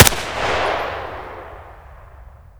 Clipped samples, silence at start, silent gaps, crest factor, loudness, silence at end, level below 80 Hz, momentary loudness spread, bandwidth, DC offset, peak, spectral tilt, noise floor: 0.3%; 0 s; none; 20 dB; -20 LUFS; 0.1 s; -36 dBFS; 22 LU; over 20 kHz; under 0.1%; 0 dBFS; -3 dB/octave; -42 dBFS